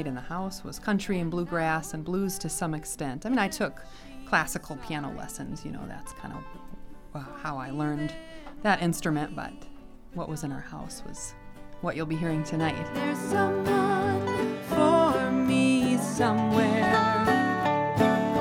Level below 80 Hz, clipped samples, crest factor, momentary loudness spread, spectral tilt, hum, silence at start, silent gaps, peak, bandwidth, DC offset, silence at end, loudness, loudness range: -48 dBFS; under 0.1%; 18 dB; 18 LU; -5.5 dB/octave; none; 0 s; none; -10 dBFS; 17.5 kHz; under 0.1%; 0 s; -27 LUFS; 12 LU